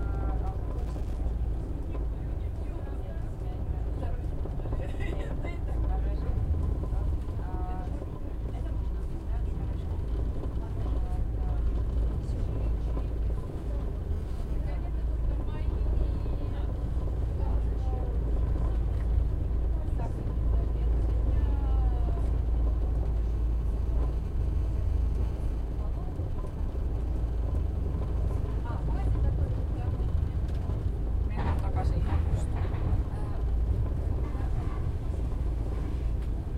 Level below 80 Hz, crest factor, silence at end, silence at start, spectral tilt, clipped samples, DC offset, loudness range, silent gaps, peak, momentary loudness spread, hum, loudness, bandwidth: -30 dBFS; 14 dB; 0 s; 0 s; -9 dB/octave; under 0.1%; under 0.1%; 5 LU; none; -14 dBFS; 6 LU; none; -32 LUFS; 4.6 kHz